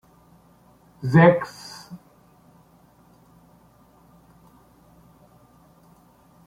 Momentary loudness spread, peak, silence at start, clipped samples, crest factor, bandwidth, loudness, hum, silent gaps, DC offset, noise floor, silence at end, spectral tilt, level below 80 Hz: 28 LU; -2 dBFS; 1.05 s; under 0.1%; 24 dB; 11.5 kHz; -19 LUFS; none; none; under 0.1%; -55 dBFS; 4.5 s; -8 dB/octave; -60 dBFS